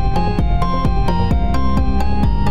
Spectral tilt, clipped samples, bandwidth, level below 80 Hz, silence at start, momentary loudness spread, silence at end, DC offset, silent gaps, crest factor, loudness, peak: -8 dB/octave; under 0.1%; 9.6 kHz; -18 dBFS; 0 s; 1 LU; 0 s; 9%; none; 12 dB; -18 LUFS; -6 dBFS